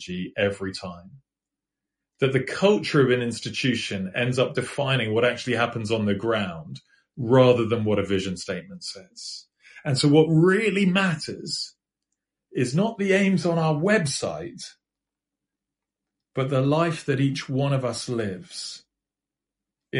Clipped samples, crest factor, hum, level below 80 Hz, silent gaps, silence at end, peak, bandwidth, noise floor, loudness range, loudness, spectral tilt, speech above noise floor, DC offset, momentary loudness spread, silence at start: under 0.1%; 20 dB; none; -62 dBFS; none; 0 s; -6 dBFS; 11.5 kHz; -88 dBFS; 4 LU; -23 LUFS; -5.5 dB/octave; 65 dB; under 0.1%; 17 LU; 0 s